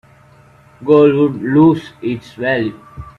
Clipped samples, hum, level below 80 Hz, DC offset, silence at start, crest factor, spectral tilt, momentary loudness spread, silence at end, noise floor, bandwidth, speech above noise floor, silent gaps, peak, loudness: under 0.1%; 50 Hz at -35 dBFS; -48 dBFS; under 0.1%; 0.8 s; 16 dB; -8.5 dB/octave; 14 LU; 0.1 s; -46 dBFS; 6.8 kHz; 32 dB; none; 0 dBFS; -14 LUFS